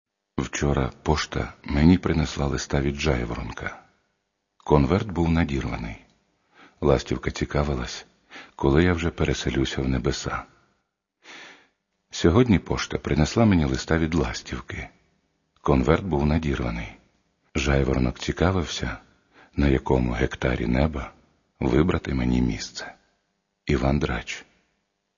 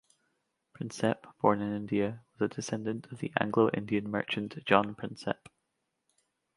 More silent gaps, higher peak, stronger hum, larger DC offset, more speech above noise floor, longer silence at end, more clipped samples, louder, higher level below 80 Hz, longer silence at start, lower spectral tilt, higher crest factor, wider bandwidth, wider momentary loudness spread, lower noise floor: neither; first, -2 dBFS vs -6 dBFS; neither; neither; about the same, 53 dB vs 51 dB; second, 0.75 s vs 1.2 s; neither; first, -24 LUFS vs -32 LUFS; first, -34 dBFS vs -68 dBFS; second, 0.35 s vs 0.8 s; about the same, -6 dB/octave vs -6 dB/octave; about the same, 24 dB vs 26 dB; second, 7.4 kHz vs 11.5 kHz; first, 16 LU vs 11 LU; second, -76 dBFS vs -82 dBFS